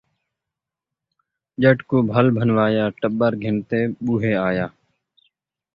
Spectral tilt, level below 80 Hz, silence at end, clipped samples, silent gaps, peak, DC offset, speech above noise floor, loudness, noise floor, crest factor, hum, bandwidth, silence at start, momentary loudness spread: -10 dB/octave; -54 dBFS; 1.05 s; under 0.1%; none; -2 dBFS; under 0.1%; 67 dB; -20 LUFS; -86 dBFS; 20 dB; none; 5.2 kHz; 1.6 s; 7 LU